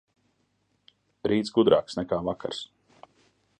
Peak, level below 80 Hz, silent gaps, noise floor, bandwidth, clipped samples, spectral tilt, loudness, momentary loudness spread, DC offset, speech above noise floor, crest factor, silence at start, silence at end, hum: -6 dBFS; -60 dBFS; none; -72 dBFS; 10 kHz; under 0.1%; -6 dB/octave; -26 LUFS; 14 LU; under 0.1%; 47 dB; 22 dB; 1.25 s; 0.95 s; none